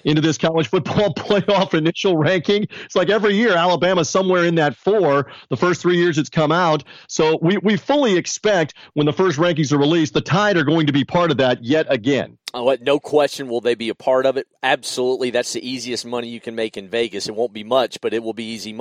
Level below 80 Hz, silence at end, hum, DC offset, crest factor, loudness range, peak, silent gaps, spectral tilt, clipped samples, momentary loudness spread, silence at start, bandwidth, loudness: -56 dBFS; 0 s; none; under 0.1%; 16 dB; 5 LU; -2 dBFS; none; -5 dB/octave; under 0.1%; 8 LU; 0.05 s; 13.5 kHz; -18 LUFS